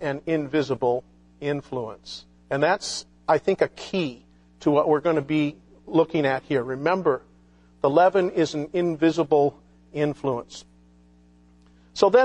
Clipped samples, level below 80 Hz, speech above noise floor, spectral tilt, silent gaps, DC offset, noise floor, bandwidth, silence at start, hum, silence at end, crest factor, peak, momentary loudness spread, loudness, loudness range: under 0.1%; -58 dBFS; 33 dB; -6 dB/octave; none; under 0.1%; -55 dBFS; 10.5 kHz; 0 s; 60 Hz at -55 dBFS; 0 s; 22 dB; -2 dBFS; 12 LU; -24 LUFS; 4 LU